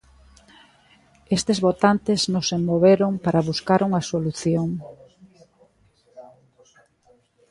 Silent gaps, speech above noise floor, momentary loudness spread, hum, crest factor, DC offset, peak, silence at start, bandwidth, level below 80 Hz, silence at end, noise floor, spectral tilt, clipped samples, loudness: none; 40 dB; 8 LU; none; 20 dB; under 0.1%; -4 dBFS; 1.3 s; 11.5 kHz; -56 dBFS; 1.25 s; -61 dBFS; -5.5 dB/octave; under 0.1%; -21 LUFS